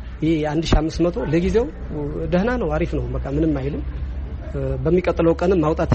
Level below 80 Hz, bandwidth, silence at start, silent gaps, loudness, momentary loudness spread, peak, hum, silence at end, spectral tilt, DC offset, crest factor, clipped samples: -28 dBFS; 8.4 kHz; 0 s; none; -21 LUFS; 10 LU; -6 dBFS; none; 0 s; -7.5 dB/octave; under 0.1%; 16 dB; under 0.1%